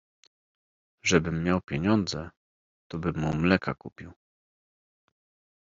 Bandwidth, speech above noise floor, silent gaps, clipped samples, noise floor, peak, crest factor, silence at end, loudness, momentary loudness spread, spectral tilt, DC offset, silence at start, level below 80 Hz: 7.6 kHz; over 63 dB; 2.37-2.90 s; under 0.1%; under -90 dBFS; -6 dBFS; 24 dB; 1.5 s; -27 LUFS; 16 LU; -5 dB/octave; under 0.1%; 1.05 s; -54 dBFS